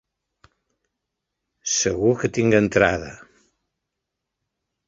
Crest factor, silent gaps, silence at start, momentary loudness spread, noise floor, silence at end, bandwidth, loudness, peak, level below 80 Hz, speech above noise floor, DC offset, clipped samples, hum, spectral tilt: 22 dB; none; 1.65 s; 13 LU; -82 dBFS; 1.7 s; 8 kHz; -20 LUFS; -2 dBFS; -50 dBFS; 62 dB; under 0.1%; under 0.1%; none; -4 dB/octave